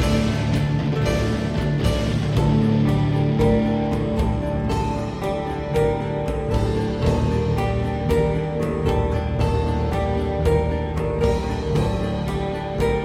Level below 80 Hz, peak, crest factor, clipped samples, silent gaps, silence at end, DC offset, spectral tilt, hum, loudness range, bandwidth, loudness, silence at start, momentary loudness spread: -28 dBFS; -6 dBFS; 14 dB; under 0.1%; none; 0 s; under 0.1%; -7.5 dB/octave; none; 2 LU; 15 kHz; -22 LUFS; 0 s; 5 LU